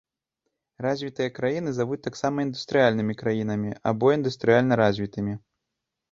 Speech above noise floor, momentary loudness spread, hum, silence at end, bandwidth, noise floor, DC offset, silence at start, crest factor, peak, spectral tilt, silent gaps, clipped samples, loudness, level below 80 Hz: 59 dB; 9 LU; none; 0.75 s; 7.6 kHz; -84 dBFS; under 0.1%; 0.8 s; 20 dB; -6 dBFS; -6.5 dB/octave; none; under 0.1%; -25 LUFS; -60 dBFS